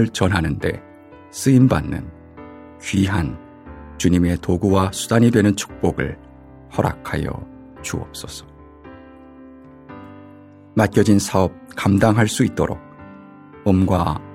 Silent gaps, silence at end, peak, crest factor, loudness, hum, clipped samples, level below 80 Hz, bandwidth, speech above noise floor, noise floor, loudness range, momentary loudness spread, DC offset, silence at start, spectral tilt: none; 0 s; -2 dBFS; 18 dB; -19 LUFS; none; under 0.1%; -42 dBFS; 16.5 kHz; 25 dB; -43 dBFS; 9 LU; 24 LU; under 0.1%; 0 s; -6 dB/octave